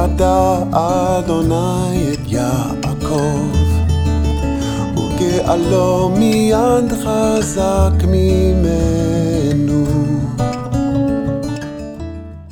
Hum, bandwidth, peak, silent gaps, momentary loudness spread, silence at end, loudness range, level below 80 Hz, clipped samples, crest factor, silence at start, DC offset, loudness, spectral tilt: none; 17 kHz; -2 dBFS; none; 7 LU; 0 s; 3 LU; -24 dBFS; under 0.1%; 14 dB; 0 s; under 0.1%; -16 LUFS; -6.5 dB/octave